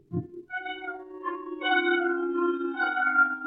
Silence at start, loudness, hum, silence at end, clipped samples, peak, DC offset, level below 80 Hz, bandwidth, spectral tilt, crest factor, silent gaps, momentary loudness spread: 0.1 s; -28 LUFS; none; 0 s; under 0.1%; -12 dBFS; under 0.1%; -72 dBFS; 4.7 kHz; -8 dB/octave; 16 dB; none; 13 LU